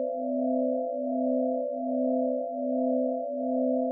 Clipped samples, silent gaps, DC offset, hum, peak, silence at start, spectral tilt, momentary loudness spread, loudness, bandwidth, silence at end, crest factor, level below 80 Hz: under 0.1%; none; under 0.1%; none; -18 dBFS; 0 s; 5 dB/octave; 3 LU; -29 LUFS; 0.8 kHz; 0 s; 10 dB; under -90 dBFS